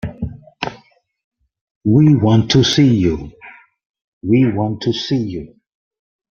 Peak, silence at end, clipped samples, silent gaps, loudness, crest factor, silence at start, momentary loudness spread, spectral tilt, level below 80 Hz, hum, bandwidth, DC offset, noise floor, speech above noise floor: -2 dBFS; 0.9 s; under 0.1%; 1.24-1.31 s, 1.61-1.81 s, 3.86-3.94 s, 4.04-4.21 s; -15 LUFS; 16 dB; 0.05 s; 17 LU; -6.5 dB/octave; -44 dBFS; none; 7.2 kHz; under 0.1%; -49 dBFS; 35 dB